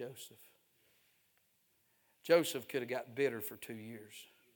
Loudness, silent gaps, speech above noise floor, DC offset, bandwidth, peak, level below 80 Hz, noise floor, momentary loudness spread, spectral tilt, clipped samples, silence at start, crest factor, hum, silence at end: -36 LUFS; none; 38 dB; under 0.1%; 19.5 kHz; -14 dBFS; -90 dBFS; -76 dBFS; 21 LU; -4 dB/octave; under 0.1%; 0 s; 26 dB; none; 0.3 s